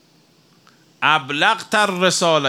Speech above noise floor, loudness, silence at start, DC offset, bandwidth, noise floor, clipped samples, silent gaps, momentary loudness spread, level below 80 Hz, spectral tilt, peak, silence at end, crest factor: 38 dB; -17 LUFS; 1 s; under 0.1%; 16.5 kHz; -55 dBFS; under 0.1%; none; 2 LU; -72 dBFS; -2.5 dB/octave; -2 dBFS; 0 s; 18 dB